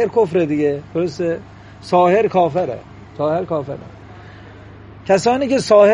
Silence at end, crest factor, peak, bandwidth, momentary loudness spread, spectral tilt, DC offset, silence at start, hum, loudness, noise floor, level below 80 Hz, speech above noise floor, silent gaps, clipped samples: 0 s; 16 dB; 0 dBFS; 10.5 kHz; 20 LU; -6 dB/octave; under 0.1%; 0 s; none; -17 LUFS; -38 dBFS; -50 dBFS; 22 dB; none; under 0.1%